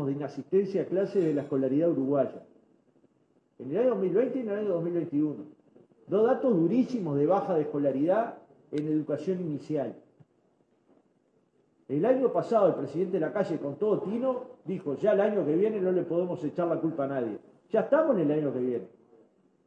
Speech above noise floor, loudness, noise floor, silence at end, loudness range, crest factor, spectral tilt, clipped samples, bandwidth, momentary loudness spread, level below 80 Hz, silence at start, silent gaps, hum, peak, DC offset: 41 dB; -28 LUFS; -69 dBFS; 0.8 s; 4 LU; 18 dB; -9 dB/octave; under 0.1%; 8.2 kHz; 9 LU; -80 dBFS; 0 s; none; none; -10 dBFS; under 0.1%